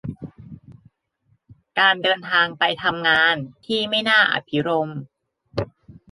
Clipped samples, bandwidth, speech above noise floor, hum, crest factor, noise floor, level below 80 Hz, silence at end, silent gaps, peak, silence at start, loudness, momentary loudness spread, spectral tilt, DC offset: under 0.1%; 11.5 kHz; 45 dB; none; 20 dB; -65 dBFS; -56 dBFS; 0.2 s; none; -2 dBFS; 0.05 s; -19 LUFS; 18 LU; -5 dB/octave; under 0.1%